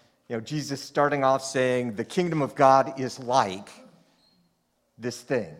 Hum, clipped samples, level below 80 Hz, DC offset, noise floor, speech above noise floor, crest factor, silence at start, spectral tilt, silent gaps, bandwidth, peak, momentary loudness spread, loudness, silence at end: none; under 0.1%; -68 dBFS; under 0.1%; -71 dBFS; 47 dB; 22 dB; 0.3 s; -5 dB/octave; none; 15.5 kHz; -4 dBFS; 16 LU; -25 LUFS; 0.05 s